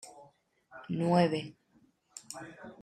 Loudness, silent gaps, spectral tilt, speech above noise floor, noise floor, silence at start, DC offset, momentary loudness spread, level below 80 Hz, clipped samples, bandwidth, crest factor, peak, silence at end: -30 LUFS; none; -6.5 dB/octave; 36 dB; -68 dBFS; 0.05 s; under 0.1%; 24 LU; -74 dBFS; under 0.1%; 12.5 kHz; 22 dB; -14 dBFS; 0.1 s